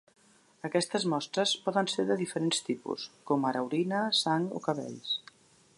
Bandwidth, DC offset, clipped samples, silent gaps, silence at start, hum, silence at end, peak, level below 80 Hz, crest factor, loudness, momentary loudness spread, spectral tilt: 11.5 kHz; under 0.1%; under 0.1%; none; 0.65 s; none; 0.6 s; -12 dBFS; -82 dBFS; 20 dB; -31 LUFS; 8 LU; -4 dB/octave